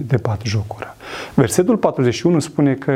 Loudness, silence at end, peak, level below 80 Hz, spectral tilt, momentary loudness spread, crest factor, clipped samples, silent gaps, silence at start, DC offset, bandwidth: -18 LUFS; 0 s; 0 dBFS; -48 dBFS; -6 dB/octave; 14 LU; 16 dB; under 0.1%; none; 0 s; under 0.1%; 16 kHz